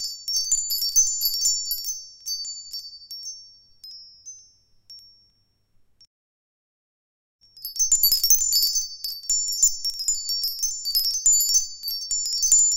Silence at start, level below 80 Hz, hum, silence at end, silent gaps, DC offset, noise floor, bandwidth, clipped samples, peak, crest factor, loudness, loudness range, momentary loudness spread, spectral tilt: 0 s; -52 dBFS; none; 0 s; 6.07-7.39 s; under 0.1%; -66 dBFS; 17 kHz; under 0.1%; -2 dBFS; 22 dB; -20 LUFS; 18 LU; 20 LU; 4.5 dB/octave